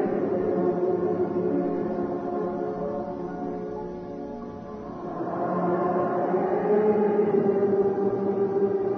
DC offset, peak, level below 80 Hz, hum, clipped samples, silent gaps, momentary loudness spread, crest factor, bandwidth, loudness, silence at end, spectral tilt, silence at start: under 0.1%; -12 dBFS; -58 dBFS; none; under 0.1%; none; 13 LU; 14 dB; 6 kHz; -26 LUFS; 0 s; -10.5 dB/octave; 0 s